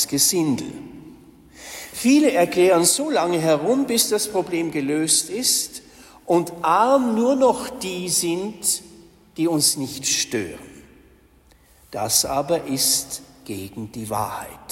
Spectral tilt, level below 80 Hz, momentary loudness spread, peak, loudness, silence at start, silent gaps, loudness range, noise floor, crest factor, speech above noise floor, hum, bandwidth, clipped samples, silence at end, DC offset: -3 dB/octave; -56 dBFS; 17 LU; -4 dBFS; -20 LUFS; 0 s; none; 5 LU; -54 dBFS; 18 dB; 33 dB; none; 16.5 kHz; under 0.1%; 0 s; under 0.1%